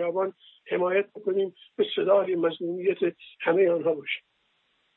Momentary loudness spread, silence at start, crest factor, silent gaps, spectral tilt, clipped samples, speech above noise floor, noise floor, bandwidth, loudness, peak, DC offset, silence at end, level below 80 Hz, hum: 10 LU; 0 s; 16 dB; none; -9.5 dB/octave; under 0.1%; 45 dB; -71 dBFS; 4.1 kHz; -27 LUFS; -10 dBFS; under 0.1%; 0.75 s; -84 dBFS; none